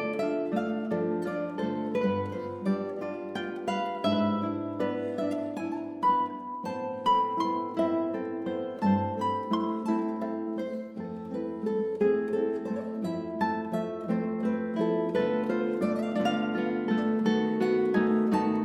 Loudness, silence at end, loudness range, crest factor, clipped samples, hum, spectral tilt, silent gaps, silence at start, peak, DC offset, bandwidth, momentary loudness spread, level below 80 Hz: -29 LUFS; 0 s; 3 LU; 16 dB; under 0.1%; none; -7.5 dB/octave; none; 0 s; -12 dBFS; under 0.1%; 11 kHz; 8 LU; -72 dBFS